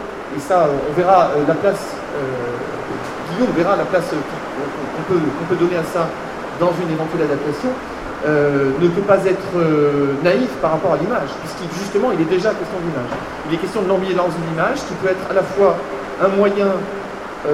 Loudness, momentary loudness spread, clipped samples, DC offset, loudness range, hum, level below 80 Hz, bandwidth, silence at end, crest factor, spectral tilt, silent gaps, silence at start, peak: -18 LUFS; 10 LU; under 0.1%; 0.2%; 3 LU; none; -46 dBFS; 15 kHz; 0 s; 18 dB; -6.5 dB/octave; none; 0 s; 0 dBFS